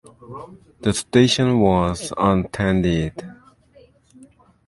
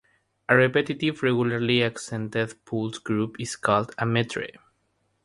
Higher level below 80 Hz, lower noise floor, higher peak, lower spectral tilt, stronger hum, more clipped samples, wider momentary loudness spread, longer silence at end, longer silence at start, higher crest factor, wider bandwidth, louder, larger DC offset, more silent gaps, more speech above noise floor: first, -40 dBFS vs -62 dBFS; second, -52 dBFS vs -71 dBFS; about the same, -2 dBFS vs -4 dBFS; about the same, -5.5 dB/octave vs -5.5 dB/octave; neither; neither; first, 22 LU vs 10 LU; first, 1.35 s vs 0.75 s; second, 0.2 s vs 0.5 s; about the same, 20 dB vs 22 dB; about the same, 11.5 kHz vs 11.5 kHz; first, -19 LUFS vs -25 LUFS; neither; neither; second, 33 dB vs 47 dB